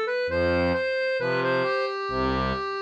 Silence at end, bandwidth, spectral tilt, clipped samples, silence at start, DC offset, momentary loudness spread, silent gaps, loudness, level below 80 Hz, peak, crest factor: 0 s; 8.4 kHz; -6.5 dB/octave; under 0.1%; 0 s; under 0.1%; 3 LU; none; -25 LUFS; -44 dBFS; -14 dBFS; 12 dB